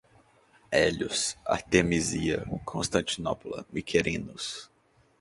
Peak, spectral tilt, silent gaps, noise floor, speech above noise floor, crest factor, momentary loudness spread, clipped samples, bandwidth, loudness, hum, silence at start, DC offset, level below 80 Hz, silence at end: -6 dBFS; -4 dB/octave; none; -61 dBFS; 33 dB; 24 dB; 11 LU; under 0.1%; 11.5 kHz; -29 LUFS; none; 0.7 s; under 0.1%; -50 dBFS; 0.55 s